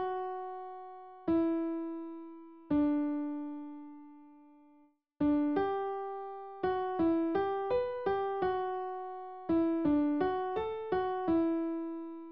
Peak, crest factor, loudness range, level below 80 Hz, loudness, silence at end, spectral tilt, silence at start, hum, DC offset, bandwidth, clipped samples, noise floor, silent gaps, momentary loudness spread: -18 dBFS; 14 dB; 4 LU; -62 dBFS; -33 LUFS; 0 s; -5.5 dB/octave; 0 s; none; 0.1%; 5.2 kHz; under 0.1%; -66 dBFS; none; 15 LU